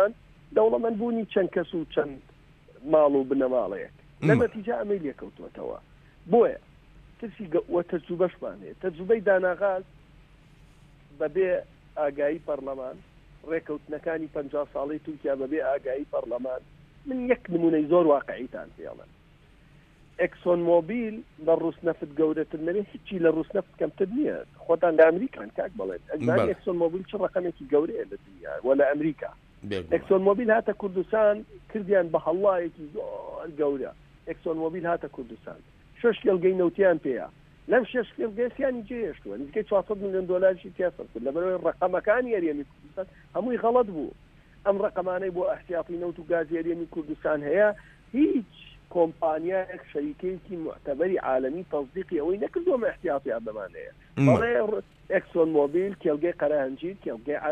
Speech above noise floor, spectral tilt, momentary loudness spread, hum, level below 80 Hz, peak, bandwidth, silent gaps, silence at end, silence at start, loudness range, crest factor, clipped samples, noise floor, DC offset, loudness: 29 dB; -8.5 dB/octave; 15 LU; none; -58 dBFS; -6 dBFS; 8.4 kHz; none; 0 s; 0 s; 5 LU; 20 dB; under 0.1%; -56 dBFS; under 0.1%; -27 LUFS